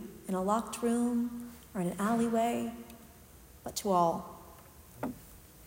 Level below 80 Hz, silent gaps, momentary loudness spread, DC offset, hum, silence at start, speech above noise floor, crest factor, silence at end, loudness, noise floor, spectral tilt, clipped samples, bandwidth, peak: -60 dBFS; none; 22 LU; under 0.1%; none; 0 s; 24 dB; 20 dB; 0 s; -33 LUFS; -55 dBFS; -5.5 dB/octave; under 0.1%; 16 kHz; -14 dBFS